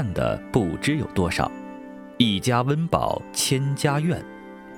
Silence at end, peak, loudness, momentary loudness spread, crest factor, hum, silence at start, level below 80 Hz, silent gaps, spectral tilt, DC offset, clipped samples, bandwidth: 0 s; -4 dBFS; -23 LUFS; 16 LU; 20 dB; none; 0 s; -46 dBFS; none; -5 dB/octave; under 0.1%; under 0.1%; 19.5 kHz